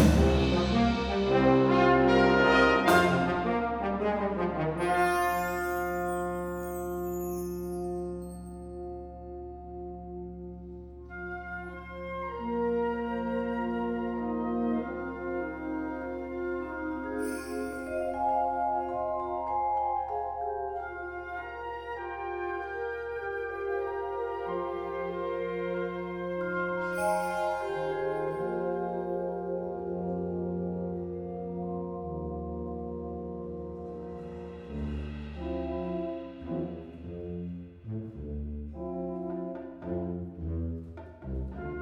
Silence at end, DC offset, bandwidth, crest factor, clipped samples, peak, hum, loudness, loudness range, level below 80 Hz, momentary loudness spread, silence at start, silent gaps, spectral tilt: 0 s; under 0.1%; 19 kHz; 22 dB; under 0.1%; -10 dBFS; none; -31 LUFS; 13 LU; -44 dBFS; 16 LU; 0 s; none; -6.5 dB/octave